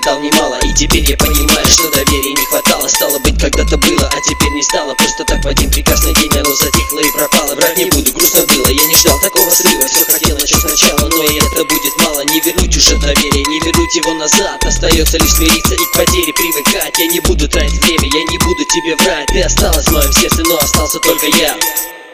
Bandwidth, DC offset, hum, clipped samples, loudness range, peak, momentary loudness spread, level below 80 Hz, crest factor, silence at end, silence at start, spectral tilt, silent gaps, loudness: over 20 kHz; under 0.1%; none; 0.4%; 3 LU; 0 dBFS; 5 LU; -18 dBFS; 12 dB; 0 s; 0 s; -2.5 dB/octave; none; -10 LUFS